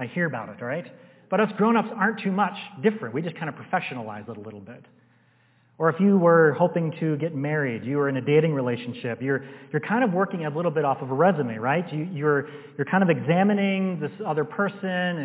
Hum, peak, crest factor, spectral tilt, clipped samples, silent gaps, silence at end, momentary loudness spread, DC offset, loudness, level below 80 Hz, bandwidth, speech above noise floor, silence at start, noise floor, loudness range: none; -6 dBFS; 18 dB; -11 dB/octave; under 0.1%; none; 0 s; 11 LU; under 0.1%; -24 LUFS; -74 dBFS; 4 kHz; 37 dB; 0 s; -61 dBFS; 6 LU